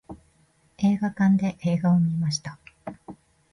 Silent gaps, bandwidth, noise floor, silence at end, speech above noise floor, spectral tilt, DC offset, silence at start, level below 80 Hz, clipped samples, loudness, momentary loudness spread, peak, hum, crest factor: none; 11 kHz; -63 dBFS; 0.4 s; 40 dB; -6.5 dB/octave; under 0.1%; 0.1 s; -60 dBFS; under 0.1%; -24 LUFS; 20 LU; -12 dBFS; none; 14 dB